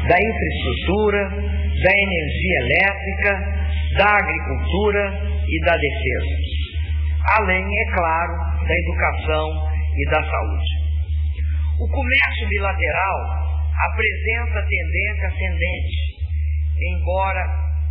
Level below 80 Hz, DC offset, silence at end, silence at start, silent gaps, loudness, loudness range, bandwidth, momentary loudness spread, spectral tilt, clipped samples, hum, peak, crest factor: -24 dBFS; under 0.1%; 0 s; 0 s; none; -20 LUFS; 3 LU; 4.1 kHz; 7 LU; -9.5 dB/octave; under 0.1%; none; -6 dBFS; 14 dB